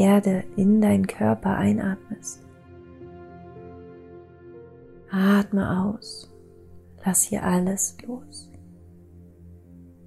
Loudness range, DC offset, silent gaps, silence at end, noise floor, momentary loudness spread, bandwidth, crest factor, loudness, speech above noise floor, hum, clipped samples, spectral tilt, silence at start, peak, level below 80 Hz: 7 LU; under 0.1%; none; 0.25 s; -48 dBFS; 24 LU; 15 kHz; 18 dB; -23 LUFS; 26 dB; none; under 0.1%; -5.5 dB/octave; 0 s; -8 dBFS; -56 dBFS